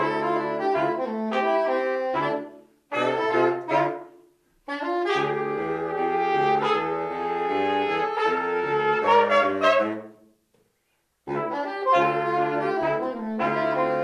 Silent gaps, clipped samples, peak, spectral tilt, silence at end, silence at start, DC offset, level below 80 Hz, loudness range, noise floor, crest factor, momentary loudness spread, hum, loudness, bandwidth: none; under 0.1%; -8 dBFS; -6 dB/octave; 0 s; 0 s; under 0.1%; -68 dBFS; 4 LU; -72 dBFS; 18 dB; 8 LU; none; -24 LUFS; 11 kHz